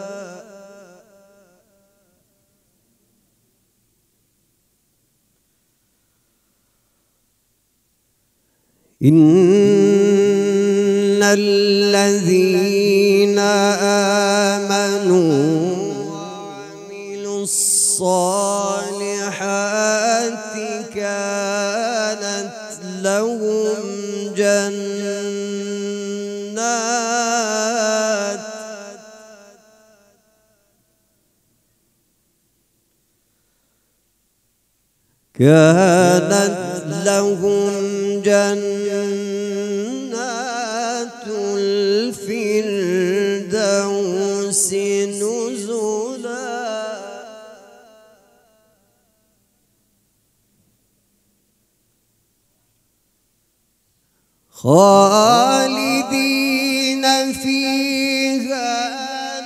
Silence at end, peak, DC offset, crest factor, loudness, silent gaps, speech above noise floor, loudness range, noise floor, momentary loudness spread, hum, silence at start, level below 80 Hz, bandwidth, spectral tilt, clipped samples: 0 s; 0 dBFS; under 0.1%; 20 dB; -17 LUFS; none; 51 dB; 8 LU; -65 dBFS; 14 LU; none; 0 s; -68 dBFS; 15.5 kHz; -4 dB/octave; under 0.1%